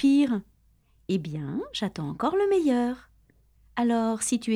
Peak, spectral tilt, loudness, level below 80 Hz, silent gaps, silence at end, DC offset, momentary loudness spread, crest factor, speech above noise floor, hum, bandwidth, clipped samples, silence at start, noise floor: -12 dBFS; -5 dB/octave; -27 LUFS; -60 dBFS; none; 0 s; under 0.1%; 10 LU; 14 dB; 38 dB; none; 14 kHz; under 0.1%; 0 s; -63 dBFS